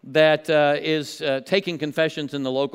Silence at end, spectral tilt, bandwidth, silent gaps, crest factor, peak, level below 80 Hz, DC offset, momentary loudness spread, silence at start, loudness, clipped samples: 0.05 s; -5 dB/octave; 15.5 kHz; none; 16 dB; -4 dBFS; -76 dBFS; under 0.1%; 8 LU; 0.05 s; -22 LUFS; under 0.1%